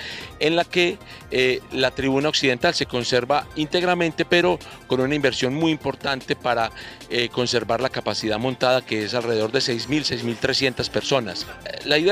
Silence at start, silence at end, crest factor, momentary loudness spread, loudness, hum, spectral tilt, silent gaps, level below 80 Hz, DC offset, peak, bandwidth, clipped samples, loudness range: 0 s; 0 s; 18 dB; 7 LU; -22 LUFS; none; -4 dB/octave; none; -50 dBFS; under 0.1%; -4 dBFS; 15.5 kHz; under 0.1%; 2 LU